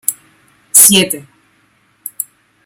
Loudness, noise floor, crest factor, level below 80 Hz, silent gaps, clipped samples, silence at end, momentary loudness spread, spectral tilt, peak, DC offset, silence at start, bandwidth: -8 LUFS; -55 dBFS; 16 dB; -56 dBFS; none; 0.7%; 0.45 s; 23 LU; -1.5 dB/octave; 0 dBFS; under 0.1%; 0.1 s; over 20 kHz